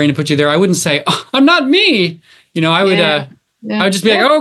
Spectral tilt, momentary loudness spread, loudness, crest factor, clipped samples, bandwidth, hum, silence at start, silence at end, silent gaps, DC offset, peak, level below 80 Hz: -4.5 dB/octave; 9 LU; -12 LUFS; 12 dB; under 0.1%; 12.5 kHz; none; 0 s; 0 s; none; under 0.1%; 0 dBFS; -60 dBFS